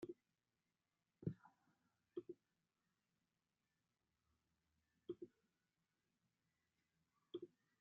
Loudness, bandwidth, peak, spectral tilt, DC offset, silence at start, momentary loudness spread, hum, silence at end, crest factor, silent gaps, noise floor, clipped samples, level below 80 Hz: -57 LUFS; 4.2 kHz; -32 dBFS; -8.5 dB/octave; under 0.1%; 0 s; 12 LU; none; 0.35 s; 28 dB; none; under -90 dBFS; under 0.1%; -86 dBFS